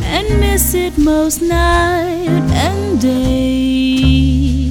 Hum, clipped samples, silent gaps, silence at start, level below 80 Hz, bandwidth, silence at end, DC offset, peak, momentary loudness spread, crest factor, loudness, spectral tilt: none; under 0.1%; none; 0 s; -20 dBFS; 19 kHz; 0 s; under 0.1%; 0 dBFS; 3 LU; 12 dB; -13 LUFS; -5 dB/octave